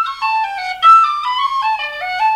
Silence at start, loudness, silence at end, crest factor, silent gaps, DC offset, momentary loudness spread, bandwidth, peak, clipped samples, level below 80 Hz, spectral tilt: 0 s; -14 LUFS; 0 s; 14 dB; none; under 0.1%; 12 LU; 12.5 kHz; 0 dBFS; under 0.1%; -56 dBFS; 1 dB/octave